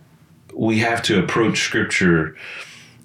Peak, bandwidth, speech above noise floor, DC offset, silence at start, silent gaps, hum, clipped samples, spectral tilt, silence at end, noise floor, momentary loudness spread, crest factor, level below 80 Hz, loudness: -4 dBFS; 14.5 kHz; 31 dB; under 0.1%; 0.5 s; none; none; under 0.1%; -4.5 dB/octave; 0.2 s; -50 dBFS; 17 LU; 16 dB; -54 dBFS; -18 LUFS